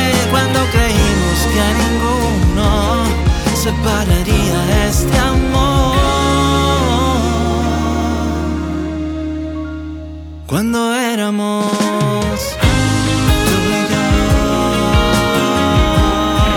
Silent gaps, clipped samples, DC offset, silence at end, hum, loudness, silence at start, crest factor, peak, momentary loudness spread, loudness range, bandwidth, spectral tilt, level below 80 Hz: none; under 0.1%; under 0.1%; 0 s; none; -14 LUFS; 0 s; 14 dB; 0 dBFS; 7 LU; 5 LU; 18.5 kHz; -5 dB/octave; -20 dBFS